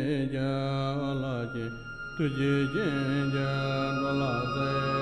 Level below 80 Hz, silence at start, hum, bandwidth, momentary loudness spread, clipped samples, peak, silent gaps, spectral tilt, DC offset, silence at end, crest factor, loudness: -50 dBFS; 0 s; none; 9.6 kHz; 7 LU; under 0.1%; -16 dBFS; none; -7.5 dB/octave; under 0.1%; 0 s; 12 dB; -30 LUFS